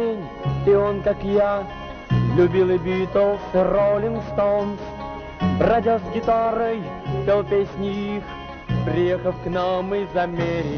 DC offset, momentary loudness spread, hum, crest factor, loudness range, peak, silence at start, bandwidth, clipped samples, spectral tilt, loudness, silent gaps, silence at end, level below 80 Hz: under 0.1%; 10 LU; none; 14 dB; 3 LU; -8 dBFS; 0 s; 6.6 kHz; under 0.1%; -6.5 dB/octave; -21 LUFS; none; 0 s; -40 dBFS